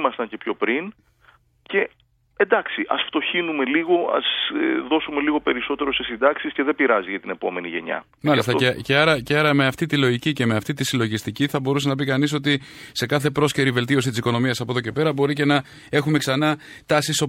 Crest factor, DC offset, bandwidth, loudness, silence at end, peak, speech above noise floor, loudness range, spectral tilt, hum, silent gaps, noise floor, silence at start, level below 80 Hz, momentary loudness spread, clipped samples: 20 dB; under 0.1%; 16 kHz; -21 LUFS; 0 s; -2 dBFS; 35 dB; 3 LU; -5 dB/octave; none; none; -57 dBFS; 0 s; -56 dBFS; 7 LU; under 0.1%